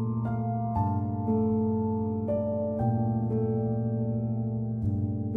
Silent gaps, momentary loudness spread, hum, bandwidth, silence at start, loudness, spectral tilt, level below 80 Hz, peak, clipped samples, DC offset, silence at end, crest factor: none; 3 LU; none; 2.4 kHz; 0 s; -29 LUFS; -13.5 dB/octave; -52 dBFS; -16 dBFS; under 0.1%; under 0.1%; 0 s; 12 dB